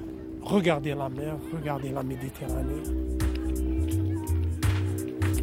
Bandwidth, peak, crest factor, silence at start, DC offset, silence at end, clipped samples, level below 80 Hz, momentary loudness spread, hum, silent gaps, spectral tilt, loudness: 16.5 kHz; -10 dBFS; 18 dB; 0 s; under 0.1%; 0 s; under 0.1%; -36 dBFS; 8 LU; none; none; -6.5 dB/octave; -30 LUFS